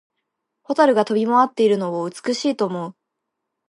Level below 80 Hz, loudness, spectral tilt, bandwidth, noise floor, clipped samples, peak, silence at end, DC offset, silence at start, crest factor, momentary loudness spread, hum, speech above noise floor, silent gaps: -76 dBFS; -19 LUFS; -5.5 dB/octave; 11.5 kHz; -79 dBFS; under 0.1%; -2 dBFS; 0.75 s; under 0.1%; 0.7 s; 18 dB; 10 LU; none; 61 dB; none